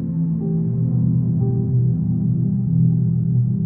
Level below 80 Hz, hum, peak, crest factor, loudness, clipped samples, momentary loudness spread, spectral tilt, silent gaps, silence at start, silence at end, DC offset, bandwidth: -40 dBFS; none; -8 dBFS; 10 dB; -19 LUFS; under 0.1%; 4 LU; -17 dB/octave; none; 0 s; 0 s; under 0.1%; 1.3 kHz